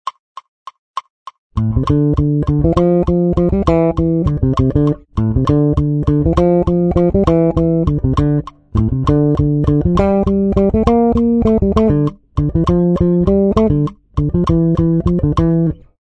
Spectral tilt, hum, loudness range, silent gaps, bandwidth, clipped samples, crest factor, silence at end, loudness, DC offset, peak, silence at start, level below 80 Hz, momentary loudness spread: -10 dB/octave; none; 1 LU; 0.19-0.35 s, 0.48-0.66 s, 0.79-0.94 s, 1.10-1.26 s, 1.38-1.50 s; 8 kHz; under 0.1%; 14 dB; 0.4 s; -14 LUFS; under 0.1%; 0 dBFS; 0.05 s; -26 dBFS; 6 LU